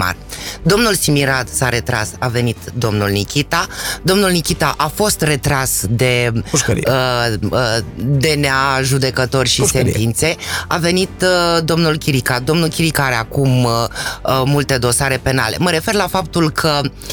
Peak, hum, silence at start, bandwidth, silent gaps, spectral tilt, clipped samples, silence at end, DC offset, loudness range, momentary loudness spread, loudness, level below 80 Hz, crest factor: -2 dBFS; none; 0 s; 19.5 kHz; none; -4 dB/octave; under 0.1%; 0 s; under 0.1%; 2 LU; 5 LU; -15 LUFS; -34 dBFS; 12 dB